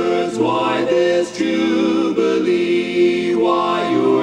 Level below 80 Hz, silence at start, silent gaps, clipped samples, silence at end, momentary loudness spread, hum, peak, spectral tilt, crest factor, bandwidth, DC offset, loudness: -58 dBFS; 0 s; none; under 0.1%; 0 s; 2 LU; none; -4 dBFS; -5.5 dB/octave; 12 dB; 10 kHz; under 0.1%; -17 LUFS